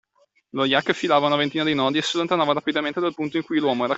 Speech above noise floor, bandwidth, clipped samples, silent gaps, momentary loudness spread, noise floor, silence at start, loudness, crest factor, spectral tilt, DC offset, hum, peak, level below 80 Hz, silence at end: 42 dB; 8.2 kHz; under 0.1%; none; 6 LU; -64 dBFS; 0.55 s; -22 LUFS; 18 dB; -4.5 dB/octave; under 0.1%; none; -4 dBFS; -66 dBFS; 0 s